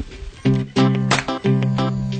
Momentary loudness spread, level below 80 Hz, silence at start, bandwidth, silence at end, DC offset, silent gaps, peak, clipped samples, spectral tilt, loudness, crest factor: 5 LU; -40 dBFS; 0 s; 9.2 kHz; 0 s; under 0.1%; none; -4 dBFS; under 0.1%; -6 dB/octave; -19 LUFS; 16 dB